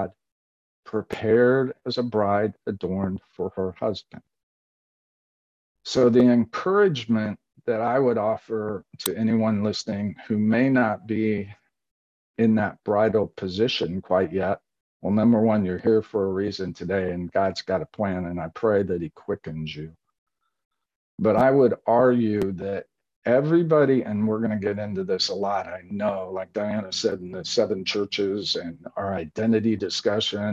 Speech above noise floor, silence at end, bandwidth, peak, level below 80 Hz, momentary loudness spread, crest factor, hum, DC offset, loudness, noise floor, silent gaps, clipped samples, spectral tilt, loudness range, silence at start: over 67 dB; 0 s; 13 kHz; -6 dBFS; -54 dBFS; 12 LU; 18 dB; none; under 0.1%; -24 LUFS; under -90 dBFS; 0.32-0.83 s, 4.43-5.75 s, 11.91-12.34 s, 14.81-15.00 s, 20.18-20.26 s, 20.65-20.71 s, 20.96-21.18 s, 23.16-23.22 s; under 0.1%; -6 dB/octave; 5 LU; 0 s